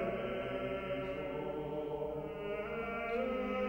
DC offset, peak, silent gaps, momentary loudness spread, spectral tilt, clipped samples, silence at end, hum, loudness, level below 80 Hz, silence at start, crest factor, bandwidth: under 0.1%; -26 dBFS; none; 4 LU; -7.5 dB/octave; under 0.1%; 0 s; none; -39 LUFS; -58 dBFS; 0 s; 14 dB; 16.5 kHz